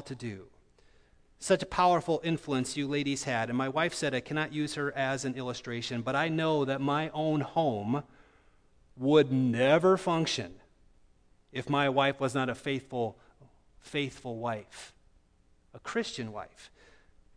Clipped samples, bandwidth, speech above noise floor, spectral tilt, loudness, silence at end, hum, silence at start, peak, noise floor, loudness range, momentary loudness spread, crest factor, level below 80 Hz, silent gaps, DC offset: under 0.1%; 11 kHz; 35 dB; -5 dB/octave; -30 LUFS; 0.7 s; none; 0 s; -10 dBFS; -65 dBFS; 10 LU; 15 LU; 20 dB; -62 dBFS; none; under 0.1%